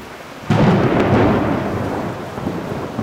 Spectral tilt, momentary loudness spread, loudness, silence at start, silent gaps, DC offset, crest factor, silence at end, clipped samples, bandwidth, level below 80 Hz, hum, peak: -7.5 dB/octave; 11 LU; -18 LUFS; 0 s; none; under 0.1%; 14 dB; 0 s; under 0.1%; 16 kHz; -38 dBFS; none; -4 dBFS